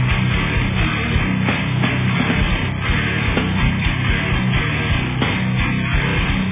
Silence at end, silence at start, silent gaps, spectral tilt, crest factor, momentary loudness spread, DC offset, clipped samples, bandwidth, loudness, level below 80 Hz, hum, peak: 0 s; 0 s; none; -10 dB/octave; 14 dB; 1 LU; under 0.1%; under 0.1%; 3.8 kHz; -18 LUFS; -26 dBFS; none; -4 dBFS